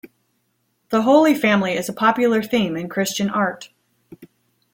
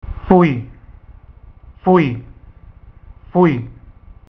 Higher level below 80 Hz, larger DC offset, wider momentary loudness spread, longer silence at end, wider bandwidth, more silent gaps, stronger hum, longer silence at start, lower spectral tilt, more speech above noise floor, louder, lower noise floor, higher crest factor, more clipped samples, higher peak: second, -62 dBFS vs -38 dBFS; neither; second, 9 LU vs 18 LU; about the same, 0.5 s vs 0.4 s; first, 17 kHz vs 5.8 kHz; neither; neither; about the same, 0.05 s vs 0.05 s; second, -5 dB/octave vs -10 dB/octave; first, 51 dB vs 28 dB; about the same, -18 LUFS vs -16 LUFS; first, -69 dBFS vs -41 dBFS; about the same, 18 dB vs 18 dB; neither; second, -4 dBFS vs 0 dBFS